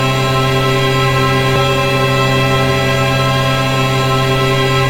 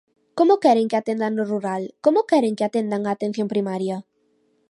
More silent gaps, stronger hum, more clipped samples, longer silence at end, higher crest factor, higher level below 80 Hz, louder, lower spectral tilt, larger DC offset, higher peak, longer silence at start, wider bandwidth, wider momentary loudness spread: neither; neither; neither; second, 0 s vs 0.7 s; second, 12 dB vs 18 dB; first, -32 dBFS vs -76 dBFS; first, -13 LUFS vs -21 LUFS; second, -5 dB/octave vs -6.5 dB/octave; neither; first, 0 dBFS vs -4 dBFS; second, 0 s vs 0.35 s; first, 16.5 kHz vs 11.5 kHz; second, 1 LU vs 10 LU